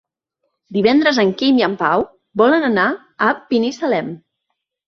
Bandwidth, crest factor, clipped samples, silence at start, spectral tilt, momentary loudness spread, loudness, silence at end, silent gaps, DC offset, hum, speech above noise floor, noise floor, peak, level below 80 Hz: 7 kHz; 16 dB; under 0.1%; 0.7 s; -5.5 dB/octave; 9 LU; -16 LUFS; 0.7 s; none; under 0.1%; none; 60 dB; -75 dBFS; -2 dBFS; -60 dBFS